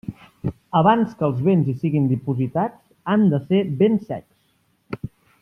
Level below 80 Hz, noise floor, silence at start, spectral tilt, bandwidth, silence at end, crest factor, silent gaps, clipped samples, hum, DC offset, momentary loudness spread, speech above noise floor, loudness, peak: -56 dBFS; -64 dBFS; 0.1 s; -10 dB/octave; 5.6 kHz; 0.35 s; 16 dB; none; under 0.1%; none; under 0.1%; 16 LU; 45 dB; -20 LUFS; -4 dBFS